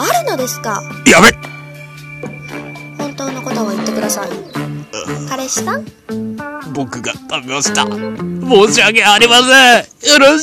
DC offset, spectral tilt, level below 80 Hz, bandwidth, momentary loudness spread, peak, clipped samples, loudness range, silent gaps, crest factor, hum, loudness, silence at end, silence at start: under 0.1%; -2.5 dB/octave; -46 dBFS; over 20 kHz; 21 LU; 0 dBFS; 0.7%; 12 LU; none; 14 dB; none; -11 LUFS; 0 s; 0 s